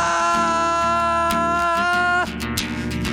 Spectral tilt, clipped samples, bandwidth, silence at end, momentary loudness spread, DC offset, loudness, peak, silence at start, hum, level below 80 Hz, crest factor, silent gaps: -4 dB/octave; under 0.1%; 16.5 kHz; 0 s; 6 LU; under 0.1%; -19 LUFS; -6 dBFS; 0 s; none; -38 dBFS; 14 dB; none